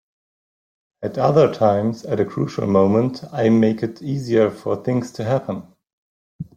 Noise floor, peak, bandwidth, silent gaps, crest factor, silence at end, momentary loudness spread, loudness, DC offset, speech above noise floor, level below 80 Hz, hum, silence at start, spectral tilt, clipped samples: under -90 dBFS; -2 dBFS; 10 kHz; 5.93-6.39 s; 18 dB; 0.15 s; 11 LU; -19 LUFS; under 0.1%; over 71 dB; -58 dBFS; none; 1 s; -8 dB/octave; under 0.1%